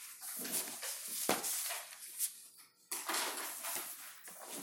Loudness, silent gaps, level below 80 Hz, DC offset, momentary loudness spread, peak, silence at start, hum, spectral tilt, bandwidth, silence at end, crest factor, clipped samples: -39 LUFS; none; under -90 dBFS; under 0.1%; 13 LU; -8 dBFS; 0 s; none; 0 dB/octave; 17 kHz; 0 s; 34 dB; under 0.1%